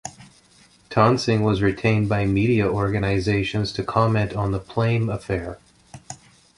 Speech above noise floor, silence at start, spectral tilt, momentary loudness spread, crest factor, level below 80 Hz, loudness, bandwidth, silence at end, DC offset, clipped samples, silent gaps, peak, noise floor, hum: 34 dB; 0.05 s; -7 dB/octave; 15 LU; 20 dB; -42 dBFS; -21 LUFS; 11 kHz; 0.45 s; under 0.1%; under 0.1%; none; -2 dBFS; -54 dBFS; none